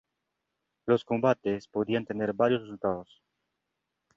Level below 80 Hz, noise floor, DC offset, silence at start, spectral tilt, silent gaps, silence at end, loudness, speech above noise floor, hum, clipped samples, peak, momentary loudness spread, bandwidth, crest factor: -66 dBFS; -84 dBFS; under 0.1%; 0.85 s; -7.5 dB/octave; none; 1.15 s; -29 LUFS; 55 dB; none; under 0.1%; -10 dBFS; 6 LU; 7.4 kHz; 20 dB